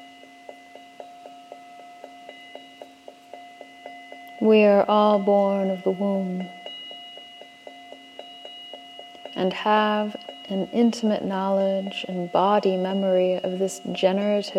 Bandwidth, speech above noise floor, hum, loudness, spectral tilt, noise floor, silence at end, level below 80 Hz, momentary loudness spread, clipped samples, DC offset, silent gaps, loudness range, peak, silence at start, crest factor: 13 kHz; 25 dB; none; -22 LUFS; -6 dB/octave; -47 dBFS; 0 s; -74 dBFS; 25 LU; under 0.1%; under 0.1%; none; 22 LU; -6 dBFS; 0 s; 18 dB